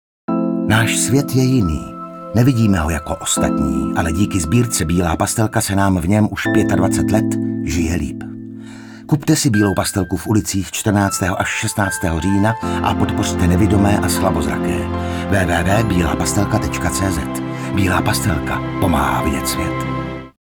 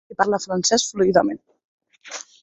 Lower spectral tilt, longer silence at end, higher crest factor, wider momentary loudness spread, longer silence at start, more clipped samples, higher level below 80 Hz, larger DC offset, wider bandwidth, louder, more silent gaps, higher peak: first, -5 dB/octave vs -3 dB/octave; about the same, 0.2 s vs 0.2 s; second, 14 dB vs 20 dB; second, 7 LU vs 17 LU; first, 0.3 s vs 0.1 s; neither; first, -34 dBFS vs -58 dBFS; neither; first, over 20 kHz vs 8.4 kHz; first, -17 LUFS vs -20 LUFS; second, none vs 1.64-1.78 s; about the same, -2 dBFS vs -2 dBFS